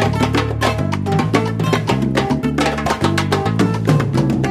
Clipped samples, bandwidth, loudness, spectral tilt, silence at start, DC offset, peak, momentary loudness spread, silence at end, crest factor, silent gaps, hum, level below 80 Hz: under 0.1%; 15 kHz; -17 LUFS; -6 dB/octave; 0 s; under 0.1%; 0 dBFS; 2 LU; 0 s; 16 dB; none; none; -34 dBFS